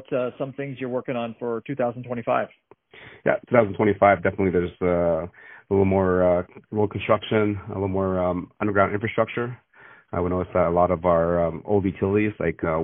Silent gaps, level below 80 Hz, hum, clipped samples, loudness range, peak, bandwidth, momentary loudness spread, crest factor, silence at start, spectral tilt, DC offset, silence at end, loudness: none; -50 dBFS; none; under 0.1%; 4 LU; -2 dBFS; 3.8 kHz; 10 LU; 22 dB; 0.1 s; -4 dB/octave; under 0.1%; 0 s; -23 LUFS